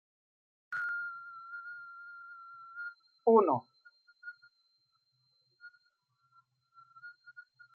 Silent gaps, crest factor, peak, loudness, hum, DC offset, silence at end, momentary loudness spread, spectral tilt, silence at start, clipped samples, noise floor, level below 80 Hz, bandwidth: none; 26 dB; -12 dBFS; -33 LUFS; none; under 0.1%; 0.35 s; 29 LU; -5.5 dB/octave; 0.7 s; under 0.1%; -76 dBFS; under -90 dBFS; 4.5 kHz